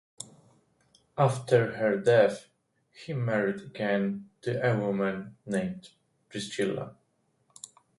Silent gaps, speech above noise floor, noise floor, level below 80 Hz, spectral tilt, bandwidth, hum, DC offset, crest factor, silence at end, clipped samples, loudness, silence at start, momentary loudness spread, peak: none; 44 dB; -72 dBFS; -68 dBFS; -6 dB/octave; 11.5 kHz; none; under 0.1%; 20 dB; 1.05 s; under 0.1%; -28 LUFS; 0.2 s; 21 LU; -10 dBFS